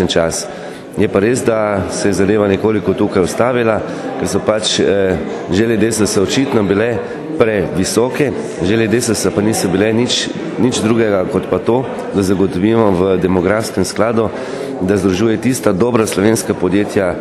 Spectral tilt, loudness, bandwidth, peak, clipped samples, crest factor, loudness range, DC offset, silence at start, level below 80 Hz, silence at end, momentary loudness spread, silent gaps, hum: -5 dB/octave; -14 LUFS; 13 kHz; 0 dBFS; under 0.1%; 14 dB; 1 LU; under 0.1%; 0 s; -44 dBFS; 0 s; 5 LU; none; none